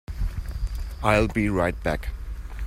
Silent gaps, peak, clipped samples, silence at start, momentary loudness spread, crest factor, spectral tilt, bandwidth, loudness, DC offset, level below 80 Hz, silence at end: none; -4 dBFS; under 0.1%; 0.1 s; 14 LU; 22 dB; -6.5 dB/octave; 16 kHz; -26 LUFS; under 0.1%; -32 dBFS; 0 s